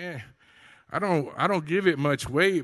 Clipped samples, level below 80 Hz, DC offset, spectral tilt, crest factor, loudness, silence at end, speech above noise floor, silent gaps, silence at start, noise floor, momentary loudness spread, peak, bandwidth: under 0.1%; -56 dBFS; under 0.1%; -5.5 dB/octave; 18 dB; -25 LUFS; 0 s; 31 dB; none; 0 s; -55 dBFS; 12 LU; -8 dBFS; 12.5 kHz